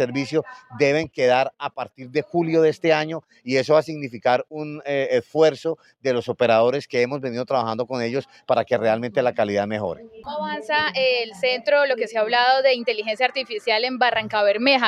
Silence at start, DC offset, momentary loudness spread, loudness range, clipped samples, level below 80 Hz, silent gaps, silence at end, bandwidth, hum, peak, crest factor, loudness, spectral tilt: 0 s; under 0.1%; 11 LU; 3 LU; under 0.1%; -66 dBFS; none; 0 s; 10.5 kHz; none; -2 dBFS; 20 dB; -21 LUFS; -5 dB/octave